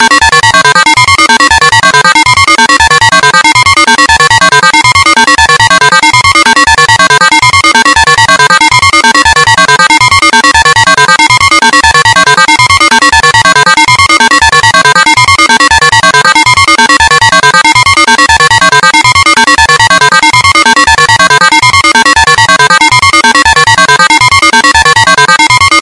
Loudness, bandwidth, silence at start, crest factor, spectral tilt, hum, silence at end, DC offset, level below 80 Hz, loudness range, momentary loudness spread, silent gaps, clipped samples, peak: -2 LUFS; 12 kHz; 0 s; 4 dB; -1.5 dB/octave; none; 0 s; under 0.1%; -30 dBFS; 0 LU; 0 LU; none; 9%; 0 dBFS